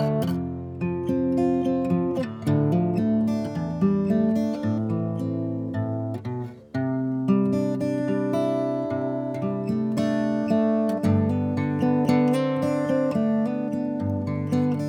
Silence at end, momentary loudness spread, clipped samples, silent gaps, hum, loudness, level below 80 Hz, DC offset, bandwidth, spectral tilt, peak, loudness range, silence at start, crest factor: 0 s; 6 LU; under 0.1%; none; none; -25 LUFS; -56 dBFS; under 0.1%; 14 kHz; -8.5 dB/octave; -8 dBFS; 3 LU; 0 s; 16 dB